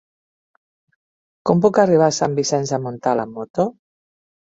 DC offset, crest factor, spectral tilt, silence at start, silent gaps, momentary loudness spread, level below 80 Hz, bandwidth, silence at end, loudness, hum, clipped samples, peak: under 0.1%; 18 dB; -5.5 dB/octave; 1.45 s; 3.50-3.54 s; 10 LU; -60 dBFS; 7.8 kHz; 0.8 s; -19 LUFS; none; under 0.1%; -2 dBFS